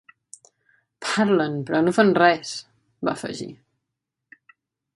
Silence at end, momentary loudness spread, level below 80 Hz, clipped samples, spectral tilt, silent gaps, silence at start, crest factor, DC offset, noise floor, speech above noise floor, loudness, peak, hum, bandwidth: 1.4 s; 17 LU; -68 dBFS; under 0.1%; -5 dB/octave; none; 1 s; 22 dB; under 0.1%; -82 dBFS; 62 dB; -21 LUFS; -2 dBFS; none; 11.5 kHz